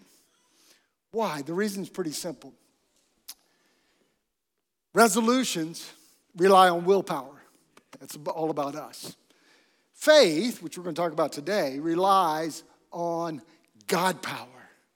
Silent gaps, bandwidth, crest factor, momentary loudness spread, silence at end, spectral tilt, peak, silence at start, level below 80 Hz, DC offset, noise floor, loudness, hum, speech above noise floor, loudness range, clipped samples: none; 18 kHz; 22 dB; 23 LU; 0.5 s; -4 dB/octave; -4 dBFS; 1.15 s; -80 dBFS; under 0.1%; -83 dBFS; -25 LUFS; none; 58 dB; 11 LU; under 0.1%